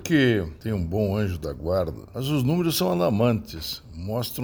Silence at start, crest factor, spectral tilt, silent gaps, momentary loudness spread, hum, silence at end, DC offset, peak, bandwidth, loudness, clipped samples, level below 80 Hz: 0 s; 16 dB; -6 dB/octave; none; 10 LU; none; 0 s; under 0.1%; -8 dBFS; over 20 kHz; -25 LUFS; under 0.1%; -44 dBFS